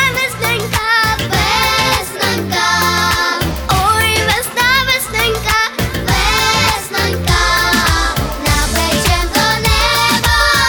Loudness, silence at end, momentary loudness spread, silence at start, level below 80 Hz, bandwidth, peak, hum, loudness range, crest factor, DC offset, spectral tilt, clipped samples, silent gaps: -13 LUFS; 0 s; 4 LU; 0 s; -24 dBFS; over 20 kHz; 0 dBFS; none; 1 LU; 14 dB; under 0.1%; -3 dB/octave; under 0.1%; none